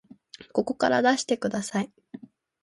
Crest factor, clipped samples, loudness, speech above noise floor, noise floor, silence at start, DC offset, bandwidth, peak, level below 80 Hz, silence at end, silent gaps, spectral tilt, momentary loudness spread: 20 dB; under 0.1%; -26 LUFS; 25 dB; -50 dBFS; 0.4 s; under 0.1%; 11.5 kHz; -8 dBFS; -68 dBFS; 0.45 s; none; -4 dB/octave; 24 LU